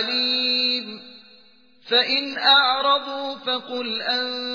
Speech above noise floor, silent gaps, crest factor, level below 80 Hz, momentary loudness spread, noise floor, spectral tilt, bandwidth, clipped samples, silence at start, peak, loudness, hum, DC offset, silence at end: 33 dB; none; 18 dB; -74 dBFS; 12 LU; -55 dBFS; -2.5 dB/octave; 5.4 kHz; under 0.1%; 0 s; -4 dBFS; -20 LUFS; none; 0.1%; 0 s